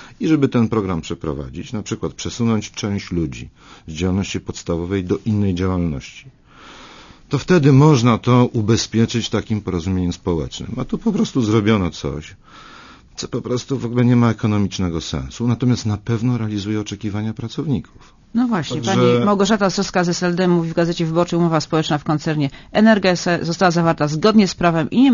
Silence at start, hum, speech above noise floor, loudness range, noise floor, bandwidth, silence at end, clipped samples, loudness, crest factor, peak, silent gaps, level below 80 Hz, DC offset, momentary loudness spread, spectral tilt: 0 s; none; 24 dB; 6 LU; -42 dBFS; 7.4 kHz; 0 s; under 0.1%; -18 LUFS; 18 dB; 0 dBFS; none; -42 dBFS; under 0.1%; 12 LU; -6 dB/octave